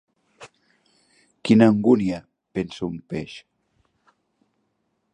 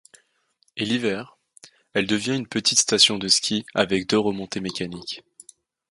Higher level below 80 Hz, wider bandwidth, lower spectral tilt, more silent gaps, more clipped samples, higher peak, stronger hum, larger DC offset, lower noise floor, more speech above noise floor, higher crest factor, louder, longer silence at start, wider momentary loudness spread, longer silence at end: about the same, -58 dBFS vs -60 dBFS; second, 9.6 kHz vs 11.5 kHz; first, -7.5 dB/octave vs -2.5 dB/octave; neither; neither; about the same, -2 dBFS vs -2 dBFS; neither; neither; first, -73 dBFS vs -67 dBFS; first, 53 dB vs 44 dB; about the same, 22 dB vs 22 dB; about the same, -21 LUFS vs -21 LUFS; second, 0.4 s vs 0.75 s; first, 18 LU vs 15 LU; first, 1.75 s vs 0.7 s